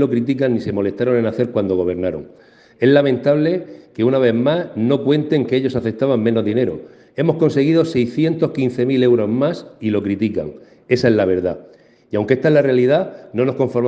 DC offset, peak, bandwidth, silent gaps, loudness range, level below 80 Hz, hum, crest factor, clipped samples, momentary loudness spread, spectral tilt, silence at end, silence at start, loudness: under 0.1%; 0 dBFS; 7.8 kHz; none; 1 LU; -56 dBFS; none; 16 dB; under 0.1%; 9 LU; -8 dB/octave; 0 s; 0 s; -17 LUFS